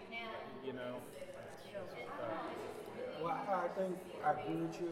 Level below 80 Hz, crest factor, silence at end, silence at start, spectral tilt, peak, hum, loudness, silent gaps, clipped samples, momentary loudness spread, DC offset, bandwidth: -76 dBFS; 20 dB; 0 s; 0 s; -6 dB/octave; -22 dBFS; none; -43 LUFS; none; under 0.1%; 11 LU; under 0.1%; 16 kHz